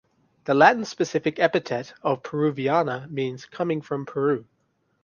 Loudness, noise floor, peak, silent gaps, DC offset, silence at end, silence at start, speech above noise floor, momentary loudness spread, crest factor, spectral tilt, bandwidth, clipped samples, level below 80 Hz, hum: -24 LUFS; -70 dBFS; -2 dBFS; none; under 0.1%; 0.6 s; 0.45 s; 47 dB; 12 LU; 22 dB; -6 dB/octave; 7.2 kHz; under 0.1%; -68 dBFS; none